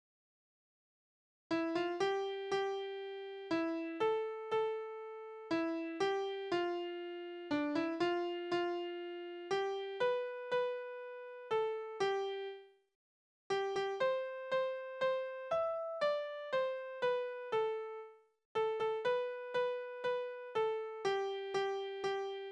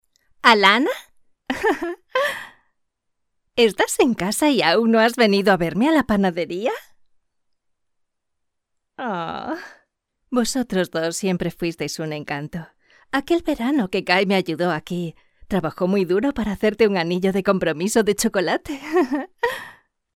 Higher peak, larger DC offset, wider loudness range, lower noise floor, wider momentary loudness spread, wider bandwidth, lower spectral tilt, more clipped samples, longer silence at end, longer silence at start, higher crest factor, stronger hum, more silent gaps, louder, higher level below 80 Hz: second, -22 dBFS vs 0 dBFS; neither; second, 2 LU vs 9 LU; first, under -90 dBFS vs -75 dBFS; second, 9 LU vs 12 LU; second, 9.8 kHz vs 17 kHz; about the same, -4.5 dB/octave vs -4.5 dB/octave; neither; second, 0 s vs 0.45 s; first, 1.5 s vs 0.45 s; second, 16 dB vs 22 dB; neither; first, 12.95-13.50 s, 18.45-18.55 s vs none; second, -38 LUFS vs -20 LUFS; second, -82 dBFS vs -50 dBFS